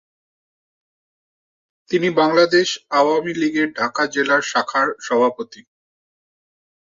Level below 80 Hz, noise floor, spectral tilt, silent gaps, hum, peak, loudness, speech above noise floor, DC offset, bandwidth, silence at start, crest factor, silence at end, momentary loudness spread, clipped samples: -68 dBFS; under -90 dBFS; -4 dB/octave; none; none; -2 dBFS; -18 LUFS; over 72 dB; under 0.1%; 7.6 kHz; 1.9 s; 18 dB; 1.3 s; 6 LU; under 0.1%